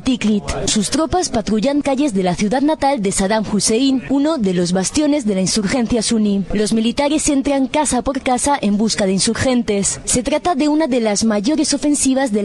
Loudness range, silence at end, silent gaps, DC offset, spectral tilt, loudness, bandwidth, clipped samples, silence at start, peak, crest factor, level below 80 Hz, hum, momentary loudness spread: 1 LU; 0 s; none; under 0.1%; -4 dB/octave; -16 LUFS; 12.5 kHz; under 0.1%; 0 s; -2 dBFS; 14 dB; -38 dBFS; none; 2 LU